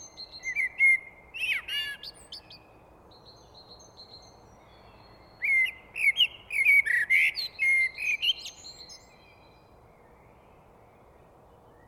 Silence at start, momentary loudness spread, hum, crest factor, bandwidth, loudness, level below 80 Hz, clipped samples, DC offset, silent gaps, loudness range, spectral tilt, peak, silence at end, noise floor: 0 s; 23 LU; none; 18 dB; 18 kHz; -24 LUFS; -64 dBFS; under 0.1%; under 0.1%; none; 12 LU; 0.5 dB/octave; -12 dBFS; 2.9 s; -56 dBFS